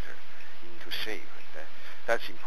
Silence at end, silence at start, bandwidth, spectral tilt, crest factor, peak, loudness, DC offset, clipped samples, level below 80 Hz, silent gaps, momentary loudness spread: 0 s; 0 s; 15 kHz; -3.5 dB/octave; 26 dB; -10 dBFS; -37 LUFS; 8%; under 0.1%; -66 dBFS; none; 17 LU